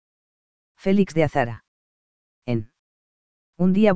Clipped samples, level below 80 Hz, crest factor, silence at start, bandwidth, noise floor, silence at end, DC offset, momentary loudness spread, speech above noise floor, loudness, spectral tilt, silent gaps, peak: under 0.1%; -52 dBFS; 20 dB; 0.75 s; 8 kHz; under -90 dBFS; 0 s; under 0.1%; 11 LU; over 70 dB; -23 LUFS; -8 dB/octave; 1.68-2.42 s, 2.79-3.53 s; -4 dBFS